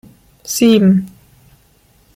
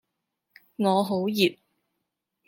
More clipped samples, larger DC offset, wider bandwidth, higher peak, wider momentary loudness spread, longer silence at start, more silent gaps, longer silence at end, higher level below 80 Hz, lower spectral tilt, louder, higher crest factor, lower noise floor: neither; neither; about the same, 16 kHz vs 16.5 kHz; first, -2 dBFS vs -8 dBFS; first, 24 LU vs 5 LU; second, 0.45 s vs 0.8 s; neither; first, 1.1 s vs 0.95 s; first, -52 dBFS vs -76 dBFS; about the same, -5.5 dB/octave vs -5.5 dB/octave; first, -13 LUFS vs -25 LUFS; about the same, 16 dB vs 20 dB; second, -52 dBFS vs -82 dBFS